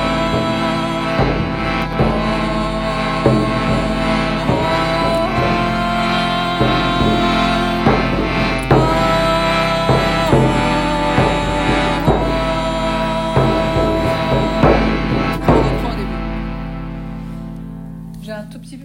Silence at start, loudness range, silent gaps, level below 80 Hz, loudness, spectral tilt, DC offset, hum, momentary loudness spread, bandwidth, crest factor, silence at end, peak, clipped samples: 0 s; 3 LU; none; -26 dBFS; -16 LUFS; -6 dB/octave; under 0.1%; none; 12 LU; 16.5 kHz; 16 dB; 0 s; 0 dBFS; under 0.1%